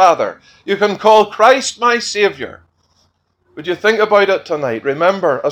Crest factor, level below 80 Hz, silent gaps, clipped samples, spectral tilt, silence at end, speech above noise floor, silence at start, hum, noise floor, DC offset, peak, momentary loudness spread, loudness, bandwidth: 14 dB; -60 dBFS; none; under 0.1%; -3.5 dB/octave; 0 s; 47 dB; 0 s; none; -60 dBFS; under 0.1%; 0 dBFS; 12 LU; -14 LUFS; 13 kHz